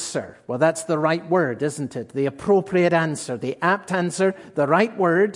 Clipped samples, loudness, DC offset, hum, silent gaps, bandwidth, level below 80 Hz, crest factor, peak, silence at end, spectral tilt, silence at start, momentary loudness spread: under 0.1%; -22 LUFS; under 0.1%; none; none; 11.5 kHz; -64 dBFS; 18 dB; -4 dBFS; 0 s; -5.5 dB/octave; 0 s; 9 LU